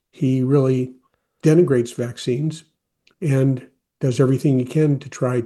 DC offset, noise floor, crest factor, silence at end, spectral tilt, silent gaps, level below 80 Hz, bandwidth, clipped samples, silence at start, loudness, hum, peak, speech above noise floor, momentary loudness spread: under 0.1%; -63 dBFS; 16 dB; 0 s; -8 dB/octave; none; -62 dBFS; 12.5 kHz; under 0.1%; 0.2 s; -20 LUFS; none; -4 dBFS; 45 dB; 11 LU